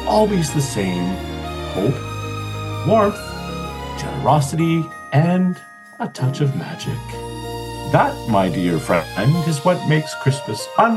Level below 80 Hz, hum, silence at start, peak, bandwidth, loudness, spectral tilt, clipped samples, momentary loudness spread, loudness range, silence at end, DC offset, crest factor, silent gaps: -40 dBFS; none; 0 s; -2 dBFS; 14.5 kHz; -20 LUFS; -6 dB/octave; under 0.1%; 11 LU; 3 LU; 0 s; under 0.1%; 18 dB; none